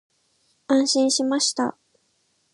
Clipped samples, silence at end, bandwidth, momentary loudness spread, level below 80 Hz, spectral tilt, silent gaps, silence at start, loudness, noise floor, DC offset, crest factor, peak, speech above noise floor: under 0.1%; 0.85 s; 11.5 kHz; 7 LU; -76 dBFS; -1.5 dB/octave; none; 0.7 s; -21 LUFS; -68 dBFS; under 0.1%; 14 dB; -10 dBFS; 47 dB